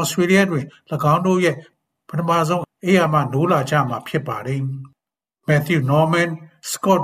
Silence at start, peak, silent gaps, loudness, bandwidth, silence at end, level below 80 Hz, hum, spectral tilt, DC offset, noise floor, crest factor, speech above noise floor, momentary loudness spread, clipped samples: 0 s; -2 dBFS; none; -19 LUFS; 15.5 kHz; 0 s; -58 dBFS; none; -6 dB/octave; under 0.1%; -87 dBFS; 18 dB; 68 dB; 12 LU; under 0.1%